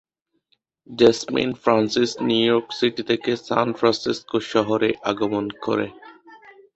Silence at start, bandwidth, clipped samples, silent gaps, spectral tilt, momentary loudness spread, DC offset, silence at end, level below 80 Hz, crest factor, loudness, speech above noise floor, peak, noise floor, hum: 0.9 s; 8.2 kHz; under 0.1%; none; -5 dB/octave; 7 LU; under 0.1%; 0.25 s; -60 dBFS; 20 dB; -21 LUFS; 48 dB; -2 dBFS; -69 dBFS; none